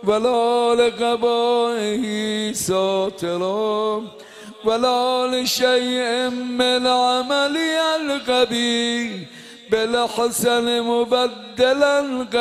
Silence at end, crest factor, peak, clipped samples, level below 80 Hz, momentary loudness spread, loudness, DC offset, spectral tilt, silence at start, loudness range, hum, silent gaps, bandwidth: 0 s; 16 dB; -4 dBFS; under 0.1%; -58 dBFS; 7 LU; -19 LUFS; under 0.1%; -3 dB/octave; 0 s; 3 LU; none; none; 15 kHz